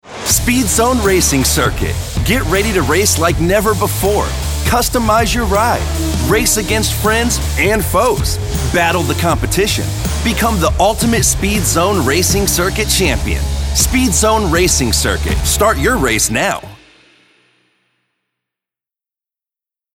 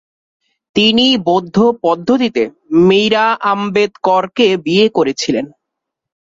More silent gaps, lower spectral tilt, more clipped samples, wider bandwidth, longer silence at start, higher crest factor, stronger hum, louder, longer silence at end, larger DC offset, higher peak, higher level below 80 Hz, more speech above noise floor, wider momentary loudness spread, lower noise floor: neither; second, -3.5 dB/octave vs -5 dB/octave; neither; first, 18.5 kHz vs 7.8 kHz; second, 0.05 s vs 0.75 s; about the same, 14 dB vs 12 dB; neither; about the same, -13 LUFS vs -13 LUFS; first, 3.2 s vs 0.85 s; neither; about the same, 0 dBFS vs 0 dBFS; first, -24 dBFS vs -54 dBFS; first, 74 dB vs 66 dB; about the same, 5 LU vs 7 LU; first, -87 dBFS vs -78 dBFS